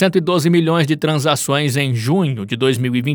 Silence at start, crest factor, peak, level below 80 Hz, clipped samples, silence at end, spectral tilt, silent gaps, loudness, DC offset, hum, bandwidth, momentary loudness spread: 0 s; 14 dB; -2 dBFS; -64 dBFS; under 0.1%; 0 s; -5.5 dB/octave; none; -16 LUFS; under 0.1%; none; over 20 kHz; 4 LU